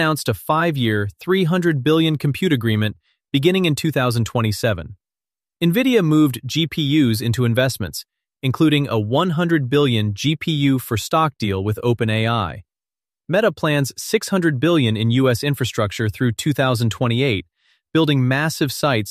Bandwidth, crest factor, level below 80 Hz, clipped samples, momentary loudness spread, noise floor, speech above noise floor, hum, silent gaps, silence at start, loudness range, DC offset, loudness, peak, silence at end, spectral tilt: 15 kHz; 14 dB; -50 dBFS; under 0.1%; 6 LU; under -90 dBFS; over 72 dB; none; none; 0 s; 2 LU; under 0.1%; -19 LUFS; -4 dBFS; 0 s; -6 dB/octave